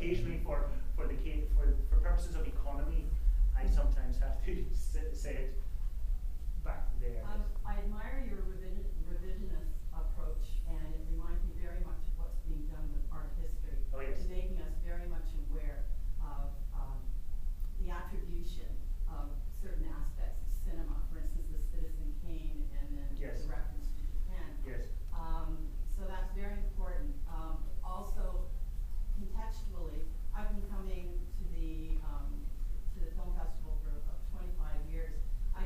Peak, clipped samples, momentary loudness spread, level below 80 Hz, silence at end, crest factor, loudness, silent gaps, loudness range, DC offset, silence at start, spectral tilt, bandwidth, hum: -18 dBFS; under 0.1%; 8 LU; -34 dBFS; 0 s; 14 dB; -41 LUFS; none; 7 LU; under 0.1%; 0 s; -7 dB/octave; 14 kHz; none